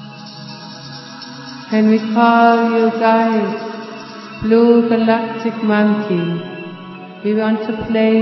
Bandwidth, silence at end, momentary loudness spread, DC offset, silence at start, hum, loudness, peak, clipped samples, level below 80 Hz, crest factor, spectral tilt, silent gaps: 6 kHz; 0 s; 20 LU; under 0.1%; 0 s; none; -15 LUFS; 0 dBFS; under 0.1%; -52 dBFS; 16 dB; -7.5 dB/octave; none